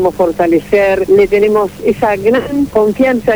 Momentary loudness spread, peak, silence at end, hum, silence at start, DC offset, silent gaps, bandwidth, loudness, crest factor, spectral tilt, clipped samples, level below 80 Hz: 4 LU; 0 dBFS; 0 s; none; 0 s; 0.5%; none; over 20 kHz; -11 LUFS; 10 dB; -6.5 dB/octave; under 0.1%; -38 dBFS